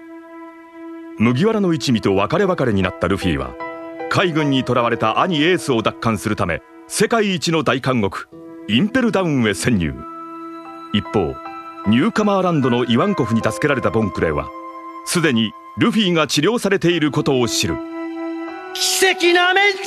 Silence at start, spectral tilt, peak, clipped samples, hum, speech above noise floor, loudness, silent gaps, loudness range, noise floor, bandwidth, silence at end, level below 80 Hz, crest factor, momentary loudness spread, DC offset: 0 s; -4.5 dB/octave; -2 dBFS; under 0.1%; none; 21 dB; -18 LUFS; none; 3 LU; -38 dBFS; 14 kHz; 0 s; -44 dBFS; 18 dB; 16 LU; under 0.1%